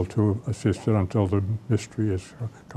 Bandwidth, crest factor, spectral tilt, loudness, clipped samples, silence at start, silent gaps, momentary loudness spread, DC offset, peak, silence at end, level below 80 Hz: 9.8 kHz; 14 dB; -8 dB/octave; -26 LUFS; under 0.1%; 0 s; none; 7 LU; under 0.1%; -10 dBFS; 0 s; -52 dBFS